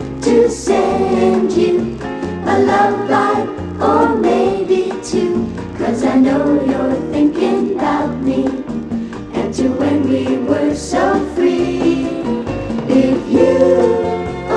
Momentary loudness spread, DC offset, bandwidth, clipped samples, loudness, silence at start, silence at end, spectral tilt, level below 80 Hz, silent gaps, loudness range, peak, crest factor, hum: 8 LU; under 0.1%; 10.5 kHz; under 0.1%; -15 LUFS; 0 s; 0 s; -6 dB/octave; -40 dBFS; none; 3 LU; 0 dBFS; 14 dB; none